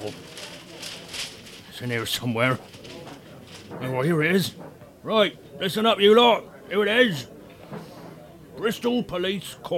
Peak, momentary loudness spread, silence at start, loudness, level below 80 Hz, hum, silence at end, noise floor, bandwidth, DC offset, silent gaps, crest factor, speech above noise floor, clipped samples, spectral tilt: -4 dBFS; 23 LU; 0 s; -23 LUFS; -60 dBFS; none; 0 s; -44 dBFS; 17 kHz; under 0.1%; none; 20 dB; 22 dB; under 0.1%; -4.5 dB/octave